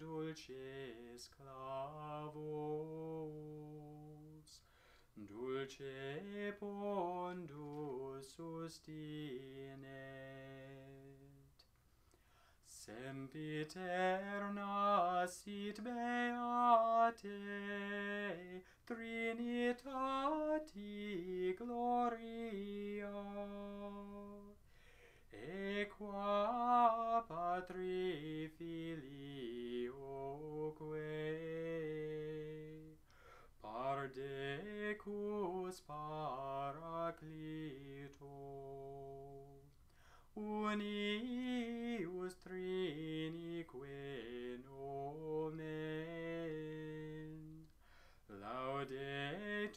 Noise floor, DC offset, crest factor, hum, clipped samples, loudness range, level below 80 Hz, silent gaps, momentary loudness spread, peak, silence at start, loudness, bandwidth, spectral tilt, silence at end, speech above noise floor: -72 dBFS; under 0.1%; 24 dB; none; under 0.1%; 12 LU; -70 dBFS; none; 16 LU; -20 dBFS; 0 s; -44 LUFS; 15.5 kHz; -6 dB/octave; 0 s; 29 dB